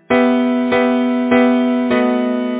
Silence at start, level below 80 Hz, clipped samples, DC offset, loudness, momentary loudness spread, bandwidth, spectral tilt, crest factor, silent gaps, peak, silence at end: 0.1 s; -54 dBFS; under 0.1%; under 0.1%; -15 LUFS; 3 LU; 4 kHz; -9 dB/octave; 12 dB; none; -2 dBFS; 0 s